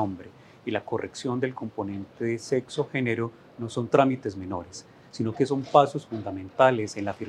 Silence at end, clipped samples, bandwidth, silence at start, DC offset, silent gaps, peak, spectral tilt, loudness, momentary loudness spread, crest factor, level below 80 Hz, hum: 0 s; under 0.1%; 11.5 kHz; 0 s; under 0.1%; none; -4 dBFS; -6 dB/octave; -27 LUFS; 14 LU; 22 dB; -68 dBFS; none